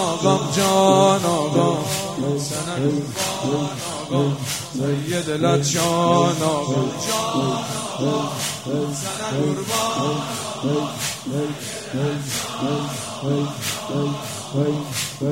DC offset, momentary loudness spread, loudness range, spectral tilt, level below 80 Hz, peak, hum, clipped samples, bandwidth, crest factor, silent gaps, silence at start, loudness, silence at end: 0.1%; 8 LU; 5 LU; -4.5 dB/octave; -56 dBFS; -2 dBFS; none; under 0.1%; 16.5 kHz; 18 dB; none; 0 s; -22 LUFS; 0 s